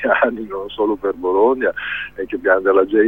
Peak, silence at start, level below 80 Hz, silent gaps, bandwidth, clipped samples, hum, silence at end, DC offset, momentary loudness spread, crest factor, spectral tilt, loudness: -2 dBFS; 0 s; -50 dBFS; none; 3.9 kHz; under 0.1%; none; 0 s; 0.3%; 11 LU; 16 dB; -7 dB/octave; -18 LUFS